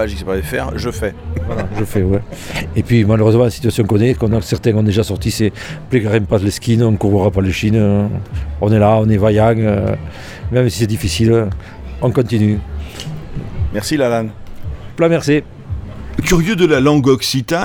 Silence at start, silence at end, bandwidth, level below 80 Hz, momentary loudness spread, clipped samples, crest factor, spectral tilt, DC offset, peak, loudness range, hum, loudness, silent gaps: 0 s; 0 s; 17 kHz; -30 dBFS; 15 LU; under 0.1%; 14 dB; -6.5 dB/octave; under 0.1%; -2 dBFS; 4 LU; none; -15 LUFS; none